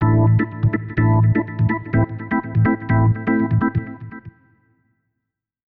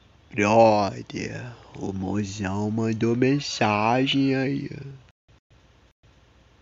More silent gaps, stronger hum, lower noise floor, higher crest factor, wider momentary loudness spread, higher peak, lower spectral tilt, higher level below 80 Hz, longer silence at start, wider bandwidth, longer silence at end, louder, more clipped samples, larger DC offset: neither; neither; first, -80 dBFS vs -56 dBFS; second, 10 dB vs 20 dB; second, 10 LU vs 18 LU; about the same, -8 dBFS vs -6 dBFS; first, -12.5 dB/octave vs -5.5 dB/octave; first, -40 dBFS vs -58 dBFS; second, 0 s vs 0.35 s; second, 3.2 kHz vs 7.8 kHz; second, 1.45 s vs 1.65 s; first, -19 LUFS vs -23 LUFS; neither; neither